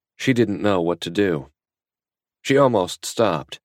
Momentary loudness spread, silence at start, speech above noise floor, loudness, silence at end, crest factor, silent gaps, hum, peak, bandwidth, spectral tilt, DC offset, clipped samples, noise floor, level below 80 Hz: 8 LU; 0.2 s; over 70 dB; -21 LUFS; 0.1 s; 18 dB; none; none; -4 dBFS; 16 kHz; -5.5 dB/octave; under 0.1%; under 0.1%; under -90 dBFS; -58 dBFS